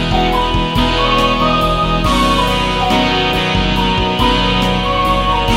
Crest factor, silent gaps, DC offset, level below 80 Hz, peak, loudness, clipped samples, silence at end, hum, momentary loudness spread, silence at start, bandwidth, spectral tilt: 12 dB; none; under 0.1%; -22 dBFS; 0 dBFS; -13 LUFS; under 0.1%; 0 s; none; 2 LU; 0 s; 16 kHz; -5 dB/octave